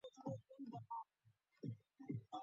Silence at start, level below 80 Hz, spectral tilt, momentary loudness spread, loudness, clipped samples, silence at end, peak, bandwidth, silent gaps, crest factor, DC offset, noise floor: 0.05 s; -84 dBFS; -8 dB/octave; 4 LU; -53 LUFS; under 0.1%; 0 s; -34 dBFS; 7.4 kHz; none; 18 dB; under 0.1%; -79 dBFS